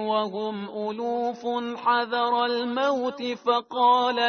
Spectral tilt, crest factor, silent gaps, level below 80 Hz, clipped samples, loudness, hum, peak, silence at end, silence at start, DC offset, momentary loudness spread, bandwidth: -4.5 dB/octave; 16 dB; none; -74 dBFS; under 0.1%; -25 LUFS; none; -10 dBFS; 0 s; 0 s; under 0.1%; 9 LU; 6.6 kHz